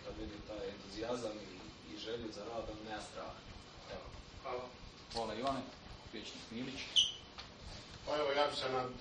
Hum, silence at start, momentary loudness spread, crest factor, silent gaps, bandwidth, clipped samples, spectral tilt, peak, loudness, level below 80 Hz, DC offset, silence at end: none; 0 s; 17 LU; 24 dB; none; 9.4 kHz; under 0.1%; -3 dB/octave; -18 dBFS; -40 LUFS; -60 dBFS; under 0.1%; 0 s